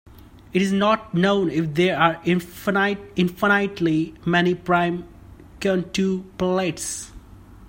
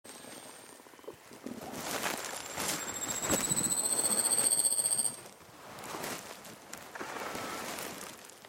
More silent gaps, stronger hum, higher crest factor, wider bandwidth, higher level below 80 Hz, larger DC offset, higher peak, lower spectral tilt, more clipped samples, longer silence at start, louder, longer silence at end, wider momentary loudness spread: neither; neither; about the same, 20 dB vs 22 dB; about the same, 16.5 kHz vs 17 kHz; first, -50 dBFS vs -66 dBFS; neither; first, -2 dBFS vs -14 dBFS; first, -5.5 dB/octave vs -1 dB/octave; neither; first, 0.55 s vs 0.05 s; first, -22 LUFS vs -31 LUFS; about the same, 0 s vs 0 s; second, 7 LU vs 23 LU